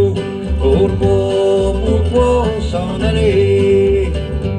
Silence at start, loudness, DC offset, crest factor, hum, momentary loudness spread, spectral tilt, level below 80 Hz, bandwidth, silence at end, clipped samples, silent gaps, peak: 0 s; -14 LUFS; under 0.1%; 12 dB; none; 7 LU; -7.5 dB/octave; -22 dBFS; 10 kHz; 0 s; under 0.1%; none; -2 dBFS